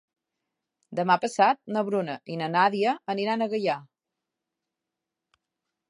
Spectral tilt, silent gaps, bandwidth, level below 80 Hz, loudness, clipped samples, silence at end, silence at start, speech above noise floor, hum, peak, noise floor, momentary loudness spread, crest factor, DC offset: -5.5 dB/octave; none; 11.5 kHz; -82 dBFS; -26 LUFS; under 0.1%; 2.05 s; 0.9 s; 61 dB; none; -6 dBFS; -86 dBFS; 9 LU; 22 dB; under 0.1%